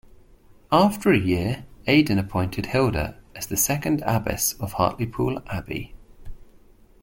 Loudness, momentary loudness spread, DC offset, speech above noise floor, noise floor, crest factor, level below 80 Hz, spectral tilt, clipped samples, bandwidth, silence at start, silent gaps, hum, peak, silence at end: -23 LUFS; 12 LU; under 0.1%; 29 dB; -52 dBFS; 20 dB; -44 dBFS; -5 dB/octave; under 0.1%; 17 kHz; 0.7 s; none; none; -4 dBFS; 0.6 s